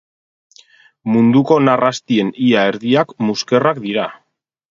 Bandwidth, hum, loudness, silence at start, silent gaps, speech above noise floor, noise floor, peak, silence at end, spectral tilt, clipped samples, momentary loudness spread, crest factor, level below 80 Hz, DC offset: 7.6 kHz; none; -15 LUFS; 1.05 s; none; 34 dB; -48 dBFS; 0 dBFS; 0.55 s; -6 dB/octave; under 0.1%; 8 LU; 16 dB; -60 dBFS; under 0.1%